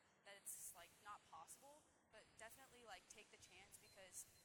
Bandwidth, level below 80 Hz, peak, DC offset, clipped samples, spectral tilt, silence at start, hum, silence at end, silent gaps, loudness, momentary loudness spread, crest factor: 19 kHz; -88 dBFS; -40 dBFS; under 0.1%; under 0.1%; -0.5 dB/octave; 0 s; none; 0 s; none; -60 LUFS; 10 LU; 22 dB